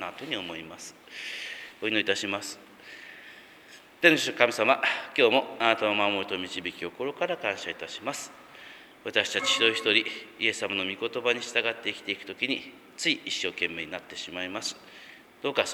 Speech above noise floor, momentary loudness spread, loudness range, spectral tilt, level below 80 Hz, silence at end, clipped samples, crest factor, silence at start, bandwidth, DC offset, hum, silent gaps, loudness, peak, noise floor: 23 dB; 21 LU; 8 LU; -2 dB/octave; -74 dBFS; 0 s; under 0.1%; 28 dB; 0 s; over 20 kHz; under 0.1%; none; none; -27 LUFS; -2 dBFS; -52 dBFS